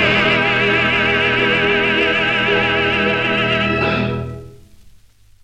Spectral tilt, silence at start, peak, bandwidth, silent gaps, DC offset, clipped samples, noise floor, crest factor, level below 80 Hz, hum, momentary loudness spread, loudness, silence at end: -5.5 dB/octave; 0 s; -2 dBFS; 10.5 kHz; none; under 0.1%; under 0.1%; -47 dBFS; 14 dB; -40 dBFS; none; 5 LU; -15 LUFS; 0.55 s